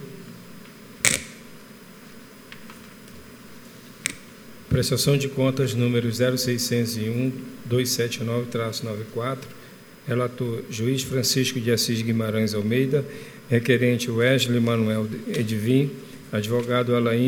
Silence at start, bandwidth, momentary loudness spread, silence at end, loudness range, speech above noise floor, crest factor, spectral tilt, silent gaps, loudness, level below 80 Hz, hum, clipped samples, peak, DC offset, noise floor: 0 s; over 20 kHz; 23 LU; 0 s; 7 LU; 22 dB; 24 dB; -5 dB/octave; none; -24 LUFS; -54 dBFS; none; under 0.1%; 0 dBFS; under 0.1%; -45 dBFS